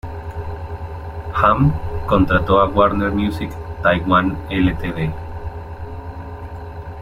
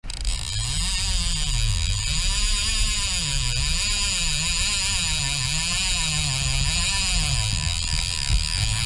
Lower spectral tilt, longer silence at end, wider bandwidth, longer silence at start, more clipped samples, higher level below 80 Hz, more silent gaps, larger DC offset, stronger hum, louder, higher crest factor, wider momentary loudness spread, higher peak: first, -8.5 dB/octave vs -1.5 dB/octave; about the same, 0 s vs 0 s; first, 14.5 kHz vs 11.5 kHz; about the same, 0.05 s vs 0.05 s; neither; about the same, -32 dBFS vs -28 dBFS; neither; neither; neither; first, -18 LUFS vs -22 LUFS; about the same, 18 dB vs 16 dB; first, 17 LU vs 3 LU; first, 0 dBFS vs -8 dBFS